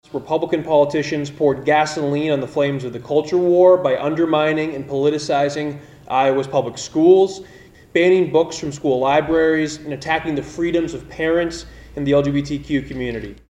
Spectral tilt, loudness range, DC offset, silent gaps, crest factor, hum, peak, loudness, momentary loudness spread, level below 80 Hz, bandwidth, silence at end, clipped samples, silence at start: -6 dB/octave; 4 LU; under 0.1%; none; 16 dB; none; -2 dBFS; -18 LUFS; 12 LU; -46 dBFS; 10.5 kHz; 0.2 s; under 0.1%; 0.15 s